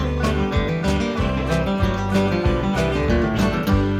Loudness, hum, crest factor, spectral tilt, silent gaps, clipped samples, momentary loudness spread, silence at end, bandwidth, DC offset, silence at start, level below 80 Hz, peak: -21 LUFS; none; 14 dB; -7 dB/octave; none; under 0.1%; 2 LU; 0 s; 15.5 kHz; under 0.1%; 0 s; -28 dBFS; -6 dBFS